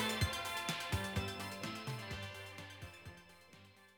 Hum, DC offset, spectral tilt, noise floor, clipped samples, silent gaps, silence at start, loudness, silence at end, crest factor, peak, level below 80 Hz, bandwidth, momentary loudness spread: none; under 0.1%; -4 dB/octave; -62 dBFS; under 0.1%; none; 0 s; -41 LUFS; 0.05 s; 20 dB; -22 dBFS; -56 dBFS; over 20 kHz; 21 LU